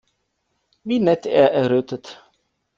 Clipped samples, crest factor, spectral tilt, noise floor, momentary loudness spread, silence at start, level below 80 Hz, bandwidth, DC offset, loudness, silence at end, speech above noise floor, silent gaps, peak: under 0.1%; 20 dB; -7 dB/octave; -72 dBFS; 19 LU; 0.85 s; -64 dBFS; 7.4 kHz; under 0.1%; -18 LUFS; 0.65 s; 54 dB; none; -2 dBFS